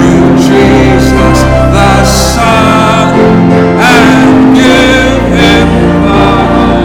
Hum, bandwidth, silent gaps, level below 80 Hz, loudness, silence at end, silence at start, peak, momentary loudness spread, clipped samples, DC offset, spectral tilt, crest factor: none; 17.5 kHz; none; -16 dBFS; -5 LUFS; 0 s; 0 s; 0 dBFS; 3 LU; 4%; under 0.1%; -5.5 dB/octave; 4 dB